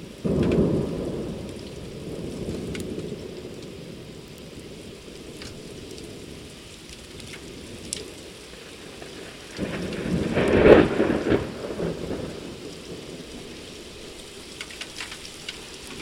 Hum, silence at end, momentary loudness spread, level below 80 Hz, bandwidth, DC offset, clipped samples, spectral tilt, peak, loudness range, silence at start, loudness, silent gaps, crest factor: none; 0 s; 18 LU; -44 dBFS; 16 kHz; under 0.1%; under 0.1%; -5.5 dB/octave; 0 dBFS; 18 LU; 0 s; -25 LUFS; none; 28 dB